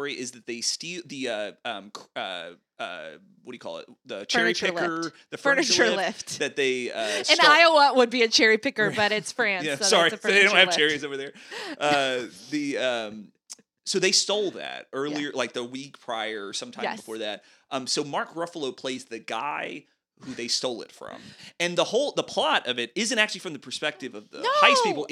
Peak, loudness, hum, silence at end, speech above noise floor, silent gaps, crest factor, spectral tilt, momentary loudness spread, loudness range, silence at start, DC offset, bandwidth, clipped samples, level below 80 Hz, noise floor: 0 dBFS; -23 LUFS; none; 0.05 s; 24 dB; none; 26 dB; -2 dB/octave; 20 LU; 12 LU; 0 s; under 0.1%; 15 kHz; under 0.1%; -78 dBFS; -49 dBFS